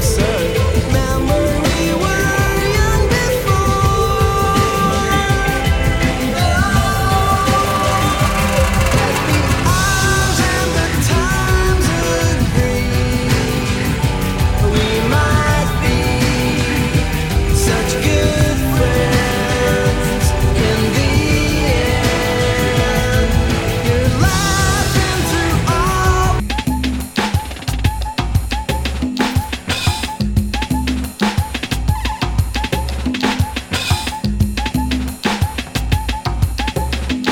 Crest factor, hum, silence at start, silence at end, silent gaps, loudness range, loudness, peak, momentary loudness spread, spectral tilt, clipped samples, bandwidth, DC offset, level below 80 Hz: 14 dB; none; 0 s; 0 s; none; 4 LU; -16 LUFS; 0 dBFS; 5 LU; -5 dB/octave; under 0.1%; 17.5 kHz; under 0.1%; -22 dBFS